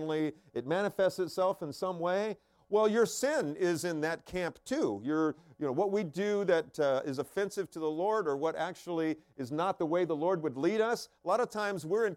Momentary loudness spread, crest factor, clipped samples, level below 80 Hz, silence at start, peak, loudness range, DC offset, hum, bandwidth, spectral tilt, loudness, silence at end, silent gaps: 7 LU; 16 dB; under 0.1%; -70 dBFS; 0 s; -16 dBFS; 2 LU; under 0.1%; none; 16.5 kHz; -5 dB/octave; -32 LUFS; 0 s; none